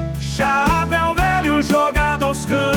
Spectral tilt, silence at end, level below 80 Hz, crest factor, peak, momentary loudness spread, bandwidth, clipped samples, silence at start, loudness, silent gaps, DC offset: -5 dB/octave; 0 s; -30 dBFS; 12 dB; -6 dBFS; 4 LU; 19.5 kHz; under 0.1%; 0 s; -17 LUFS; none; under 0.1%